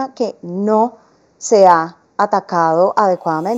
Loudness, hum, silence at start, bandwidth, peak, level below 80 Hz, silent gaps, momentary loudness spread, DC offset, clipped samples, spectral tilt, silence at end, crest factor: -15 LUFS; none; 0 s; 8.2 kHz; 0 dBFS; -68 dBFS; none; 12 LU; under 0.1%; under 0.1%; -5.5 dB/octave; 0 s; 16 dB